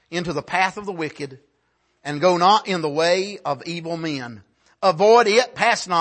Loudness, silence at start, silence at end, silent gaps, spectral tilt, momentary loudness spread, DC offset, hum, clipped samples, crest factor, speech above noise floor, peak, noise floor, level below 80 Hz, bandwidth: -20 LUFS; 0.1 s; 0 s; none; -4 dB/octave; 16 LU; under 0.1%; none; under 0.1%; 18 dB; 48 dB; -4 dBFS; -67 dBFS; -62 dBFS; 8.8 kHz